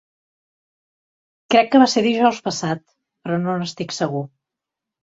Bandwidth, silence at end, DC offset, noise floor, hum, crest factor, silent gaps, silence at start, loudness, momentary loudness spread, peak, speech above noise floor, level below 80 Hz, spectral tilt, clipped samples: 8 kHz; 0.75 s; under 0.1%; -85 dBFS; none; 20 dB; none; 1.5 s; -19 LUFS; 15 LU; -2 dBFS; 67 dB; -64 dBFS; -5 dB/octave; under 0.1%